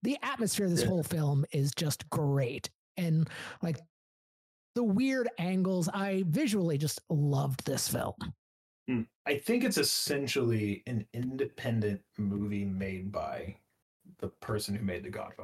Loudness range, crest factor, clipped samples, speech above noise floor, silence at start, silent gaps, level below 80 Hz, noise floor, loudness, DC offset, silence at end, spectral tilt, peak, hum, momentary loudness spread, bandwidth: 5 LU; 16 dB; under 0.1%; over 58 dB; 0 s; 2.75-2.95 s, 3.89-4.74 s, 8.38-8.86 s, 9.15-9.25 s, 13.82-14.00 s; -62 dBFS; under -90 dBFS; -32 LUFS; under 0.1%; 0 s; -5 dB/octave; -16 dBFS; none; 10 LU; 16 kHz